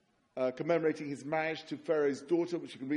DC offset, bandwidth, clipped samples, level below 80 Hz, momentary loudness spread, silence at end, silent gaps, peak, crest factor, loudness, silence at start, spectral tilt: under 0.1%; 11 kHz; under 0.1%; -80 dBFS; 8 LU; 0 s; none; -18 dBFS; 16 dB; -34 LUFS; 0.35 s; -6 dB/octave